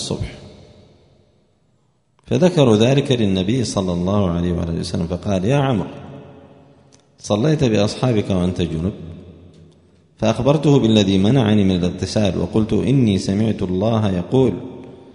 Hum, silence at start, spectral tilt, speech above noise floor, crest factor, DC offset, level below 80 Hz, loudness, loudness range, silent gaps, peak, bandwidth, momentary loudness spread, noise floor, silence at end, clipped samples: none; 0 s; -6.5 dB/octave; 45 dB; 18 dB; under 0.1%; -42 dBFS; -18 LUFS; 4 LU; none; 0 dBFS; 10.5 kHz; 12 LU; -62 dBFS; 0.05 s; under 0.1%